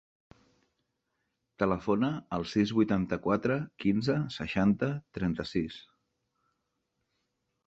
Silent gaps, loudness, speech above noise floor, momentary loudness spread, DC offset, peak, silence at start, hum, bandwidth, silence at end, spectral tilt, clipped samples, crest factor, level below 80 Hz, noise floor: none; -30 LUFS; 52 dB; 7 LU; under 0.1%; -12 dBFS; 1.6 s; none; 7.8 kHz; 1.85 s; -7.5 dB/octave; under 0.1%; 20 dB; -56 dBFS; -81 dBFS